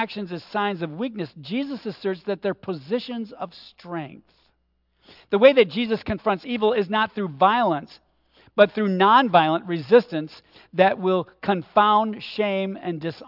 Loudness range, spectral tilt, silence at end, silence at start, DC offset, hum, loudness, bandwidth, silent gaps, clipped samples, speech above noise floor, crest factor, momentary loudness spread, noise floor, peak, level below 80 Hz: 10 LU; -8 dB/octave; 0 s; 0 s; under 0.1%; none; -22 LUFS; 5.8 kHz; none; under 0.1%; 47 dB; 20 dB; 16 LU; -69 dBFS; -2 dBFS; -60 dBFS